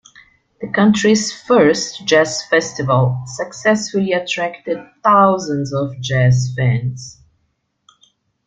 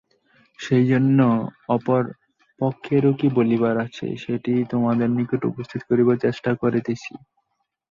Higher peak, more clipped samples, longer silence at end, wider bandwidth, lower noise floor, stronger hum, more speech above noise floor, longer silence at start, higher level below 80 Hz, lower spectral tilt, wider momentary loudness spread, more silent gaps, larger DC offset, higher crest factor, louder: first, -2 dBFS vs -6 dBFS; neither; first, 1.35 s vs 0.75 s; first, 9.2 kHz vs 7.2 kHz; second, -67 dBFS vs -75 dBFS; neither; about the same, 52 dB vs 55 dB; about the same, 0.6 s vs 0.6 s; first, -52 dBFS vs -60 dBFS; second, -5.5 dB/octave vs -8.5 dB/octave; about the same, 12 LU vs 11 LU; neither; neither; about the same, 16 dB vs 16 dB; first, -16 LUFS vs -21 LUFS